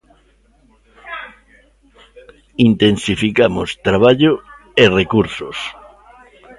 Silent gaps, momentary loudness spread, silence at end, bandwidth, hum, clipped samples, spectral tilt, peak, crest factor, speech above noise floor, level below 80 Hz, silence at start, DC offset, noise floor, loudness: none; 18 LU; 0.05 s; 11.5 kHz; none; under 0.1%; -6 dB/octave; 0 dBFS; 18 dB; 40 dB; -42 dBFS; 1.05 s; under 0.1%; -54 dBFS; -15 LUFS